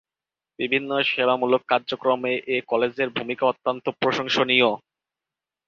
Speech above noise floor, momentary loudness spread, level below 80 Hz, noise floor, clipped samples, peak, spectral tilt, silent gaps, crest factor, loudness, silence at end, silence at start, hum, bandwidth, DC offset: 67 dB; 7 LU; -68 dBFS; -90 dBFS; under 0.1%; -4 dBFS; -4.5 dB/octave; none; 20 dB; -22 LUFS; 0.9 s; 0.6 s; none; 7.2 kHz; under 0.1%